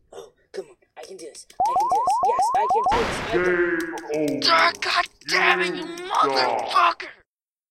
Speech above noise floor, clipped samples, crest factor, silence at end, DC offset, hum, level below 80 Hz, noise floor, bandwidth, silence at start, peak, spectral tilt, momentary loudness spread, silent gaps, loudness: 47 dB; under 0.1%; 20 dB; 0.6 s; under 0.1%; none; -50 dBFS; -68 dBFS; 16 kHz; 0.15 s; -2 dBFS; -3 dB/octave; 20 LU; none; -21 LUFS